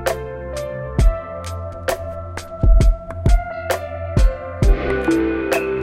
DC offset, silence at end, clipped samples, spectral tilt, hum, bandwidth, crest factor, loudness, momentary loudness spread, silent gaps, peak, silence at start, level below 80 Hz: under 0.1%; 0 s; under 0.1%; -6.5 dB/octave; none; 16 kHz; 16 dB; -21 LUFS; 11 LU; none; -2 dBFS; 0 s; -20 dBFS